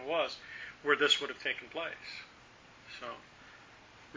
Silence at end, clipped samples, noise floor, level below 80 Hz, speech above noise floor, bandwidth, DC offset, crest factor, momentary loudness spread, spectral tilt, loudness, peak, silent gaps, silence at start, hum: 0 s; under 0.1%; -58 dBFS; -72 dBFS; 23 dB; 7.6 kHz; under 0.1%; 24 dB; 26 LU; -1.5 dB/octave; -33 LUFS; -14 dBFS; none; 0 s; none